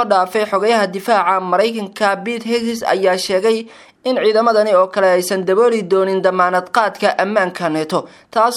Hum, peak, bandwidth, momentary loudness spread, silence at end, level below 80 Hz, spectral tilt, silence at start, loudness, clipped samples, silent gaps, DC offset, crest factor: none; 0 dBFS; 16 kHz; 7 LU; 0 s; -66 dBFS; -4.5 dB/octave; 0 s; -16 LUFS; under 0.1%; none; under 0.1%; 16 dB